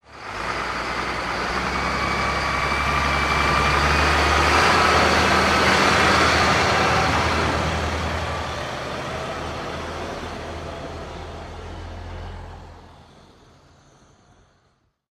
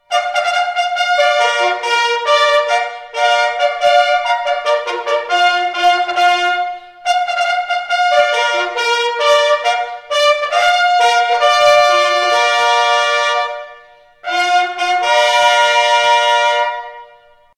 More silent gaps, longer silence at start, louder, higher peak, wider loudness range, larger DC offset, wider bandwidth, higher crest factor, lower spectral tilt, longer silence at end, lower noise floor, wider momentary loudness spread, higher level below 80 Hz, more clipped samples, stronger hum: neither; about the same, 0.1 s vs 0.1 s; second, -20 LUFS vs -13 LUFS; second, -4 dBFS vs 0 dBFS; first, 19 LU vs 3 LU; neither; first, 15.5 kHz vs 14 kHz; about the same, 18 dB vs 14 dB; first, -4 dB/octave vs 0.5 dB/octave; first, 2.1 s vs 0.5 s; first, -65 dBFS vs -46 dBFS; first, 19 LU vs 7 LU; first, -34 dBFS vs -62 dBFS; neither; neither